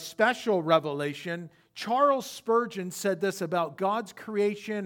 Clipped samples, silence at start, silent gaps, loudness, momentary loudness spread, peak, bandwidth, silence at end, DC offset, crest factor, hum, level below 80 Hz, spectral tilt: under 0.1%; 0 s; none; -28 LUFS; 11 LU; -8 dBFS; 18 kHz; 0 s; under 0.1%; 20 dB; none; -80 dBFS; -4.5 dB/octave